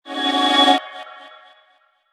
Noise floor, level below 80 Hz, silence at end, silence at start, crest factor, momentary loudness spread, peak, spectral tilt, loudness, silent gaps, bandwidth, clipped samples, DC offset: -59 dBFS; under -90 dBFS; 0.85 s; 0.05 s; 20 dB; 22 LU; 0 dBFS; -0.5 dB/octave; -16 LUFS; none; 14 kHz; under 0.1%; under 0.1%